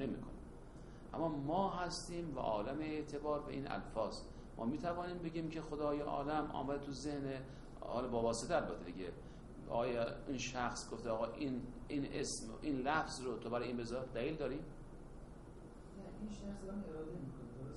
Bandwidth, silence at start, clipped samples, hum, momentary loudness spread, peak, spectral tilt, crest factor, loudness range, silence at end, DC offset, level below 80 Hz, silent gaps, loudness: 11.5 kHz; 0 s; under 0.1%; none; 16 LU; -22 dBFS; -5 dB/octave; 20 dB; 4 LU; 0 s; under 0.1%; -56 dBFS; none; -42 LUFS